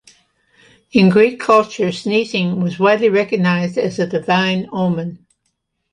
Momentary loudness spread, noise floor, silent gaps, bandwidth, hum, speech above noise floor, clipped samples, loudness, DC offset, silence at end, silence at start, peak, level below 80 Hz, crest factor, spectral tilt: 8 LU; -70 dBFS; none; 10.5 kHz; none; 55 dB; under 0.1%; -16 LUFS; under 0.1%; 0.75 s; 0.95 s; -2 dBFS; -58 dBFS; 16 dB; -6.5 dB/octave